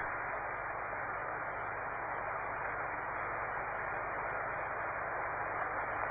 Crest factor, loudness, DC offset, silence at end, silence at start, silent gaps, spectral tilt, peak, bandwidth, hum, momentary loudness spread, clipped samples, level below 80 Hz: 16 dB; -38 LUFS; under 0.1%; 0 s; 0 s; none; -5 dB/octave; -24 dBFS; 3.8 kHz; 50 Hz at -60 dBFS; 2 LU; under 0.1%; -60 dBFS